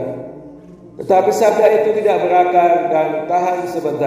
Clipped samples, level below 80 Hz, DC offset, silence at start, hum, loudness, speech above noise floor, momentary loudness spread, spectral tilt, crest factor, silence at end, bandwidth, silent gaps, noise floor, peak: under 0.1%; -60 dBFS; under 0.1%; 0 s; none; -14 LUFS; 24 dB; 13 LU; -5.5 dB/octave; 14 dB; 0 s; 16 kHz; none; -38 dBFS; 0 dBFS